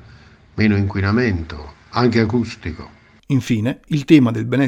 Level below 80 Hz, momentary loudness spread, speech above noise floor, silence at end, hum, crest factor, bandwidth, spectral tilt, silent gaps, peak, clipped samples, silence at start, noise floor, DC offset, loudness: -42 dBFS; 18 LU; 28 dB; 0 s; none; 18 dB; 12.5 kHz; -7.5 dB/octave; none; 0 dBFS; under 0.1%; 0.55 s; -45 dBFS; under 0.1%; -18 LUFS